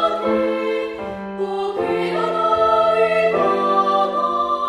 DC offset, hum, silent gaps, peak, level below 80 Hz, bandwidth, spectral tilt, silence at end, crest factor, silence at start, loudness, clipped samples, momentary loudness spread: under 0.1%; none; none; -4 dBFS; -54 dBFS; 12 kHz; -6 dB/octave; 0 s; 14 dB; 0 s; -19 LUFS; under 0.1%; 9 LU